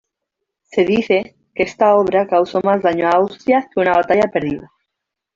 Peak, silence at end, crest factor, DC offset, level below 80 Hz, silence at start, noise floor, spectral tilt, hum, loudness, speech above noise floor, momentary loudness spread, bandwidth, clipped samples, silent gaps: -2 dBFS; 0.7 s; 14 dB; under 0.1%; -54 dBFS; 0.75 s; -80 dBFS; -6.5 dB/octave; none; -16 LUFS; 65 dB; 8 LU; 7.6 kHz; under 0.1%; none